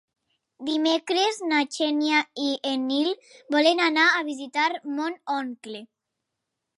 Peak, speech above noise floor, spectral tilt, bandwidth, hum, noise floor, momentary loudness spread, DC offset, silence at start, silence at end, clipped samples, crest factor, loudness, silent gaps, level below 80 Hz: -8 dBFS; 58 dB; -1.5 dB/octave; 11.5 kHz; none; -83 dBFS; 13 LU; under 0.1%; 0.6 s; 0.95 s; under 0.1%; 18 dB; -24 LUFS; none; -82 dBFS